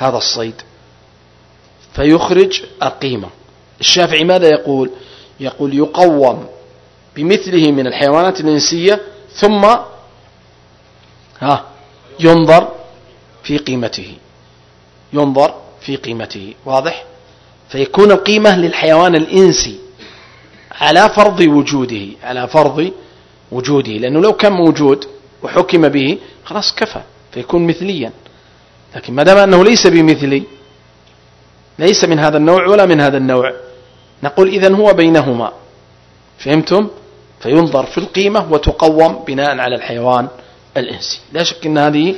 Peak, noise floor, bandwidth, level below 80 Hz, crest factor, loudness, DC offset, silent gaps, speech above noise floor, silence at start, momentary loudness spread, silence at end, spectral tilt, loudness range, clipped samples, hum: 0 dBFS; -46 dBFS; 11 kHz; -38 dBFS; 12 dB; -11 LUFS; under 0.1%; none; 35 dB; 0 s; 16 LU; 0 s; -5 dB/octave; 5 LU; 1%; 60 Hz at -45 dBFS